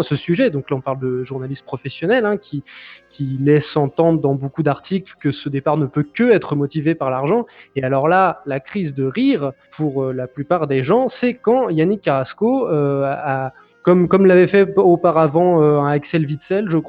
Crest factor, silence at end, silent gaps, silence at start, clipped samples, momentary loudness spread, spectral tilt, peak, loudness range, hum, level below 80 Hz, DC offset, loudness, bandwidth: 16 dB; 0 s; none; 0 s; under 0.1%; 11 LU; -10 dB/octave; -2 dBFS; 5 LU; none; -56 dBFS; under 0.1%; -17 LUFS; 5 kHz